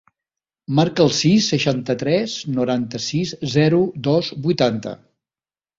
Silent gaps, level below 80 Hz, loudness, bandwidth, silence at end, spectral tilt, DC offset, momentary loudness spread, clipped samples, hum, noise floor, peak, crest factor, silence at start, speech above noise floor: none; -56 dBFS; -19 LUFS; 7.8 kHz; 0.85 s; -5.5 dB/octave; under 0.1%; 7 LU; under 0.1%; none; under -90 dBFS; -2 dBFS; 18 dB; 0.7 s; over 71 dB